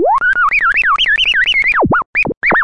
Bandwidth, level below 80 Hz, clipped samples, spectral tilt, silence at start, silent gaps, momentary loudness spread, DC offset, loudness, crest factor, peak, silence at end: 11 kHz; -36 dBFS; under 0.1%; -4 dB/octave; 0 s; 2.06-2.13 s, 2.37-2.41 s; 3 LU; 1%; -11 LUFS; 8 dB; -4 dBFS; 0 s